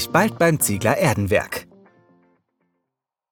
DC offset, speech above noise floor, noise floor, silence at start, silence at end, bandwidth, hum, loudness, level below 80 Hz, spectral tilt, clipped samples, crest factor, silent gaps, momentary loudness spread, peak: under 0.1%; 63 dB; -82 dBFS; 0 s; 1.7 s; over 20 kHz; none; -19 LUFS; -52 dBFS; -4.5 dB/octave; under 0.1%; 20 dB; none; 9 LU; -2 dBFS